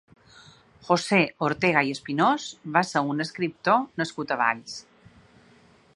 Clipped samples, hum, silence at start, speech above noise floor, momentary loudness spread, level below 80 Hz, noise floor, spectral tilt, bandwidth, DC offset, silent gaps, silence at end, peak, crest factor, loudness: under 0.1%; none; 0.85 s; 32 dB; 9 LU; -66 dBFS; -57 dBFS; -5 dB/octave; 11.5 kHz; under 0.1%; none; 1.15 s; -4 dBFS; 22 dB; -24 LUFS